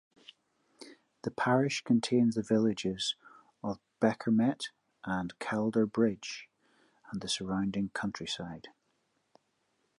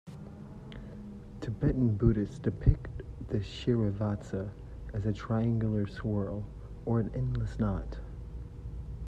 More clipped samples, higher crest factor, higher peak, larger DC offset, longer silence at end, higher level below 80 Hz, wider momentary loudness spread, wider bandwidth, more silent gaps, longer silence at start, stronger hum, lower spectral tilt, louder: neither; about the same, 20 dB vs 24 dB; second, -14 dBFS vs -10 dBFS; neither; first, 1.3 s vs 0 s; second, -66 dBFS vs -40 dBFS; about the same, 15 LU vs 17 LU; first, 11.5 kHz vs 8 kHz; neither; first, 0.8 s vs 0.05 s; neither; second, -5 dB/octave vs -9 dB/octave; about the same, -32 LUFS vs -32 LUFS